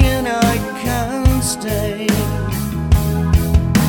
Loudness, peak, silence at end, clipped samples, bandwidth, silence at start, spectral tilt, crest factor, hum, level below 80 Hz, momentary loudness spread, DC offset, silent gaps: -17 LUFS; 0 dBFS; 0 s; under 0.1%; 17.5 kHz; 0 s; -5.5 dB/octave; 16 dB; none; -22 dBFS; 5 LU; under 0.1%; none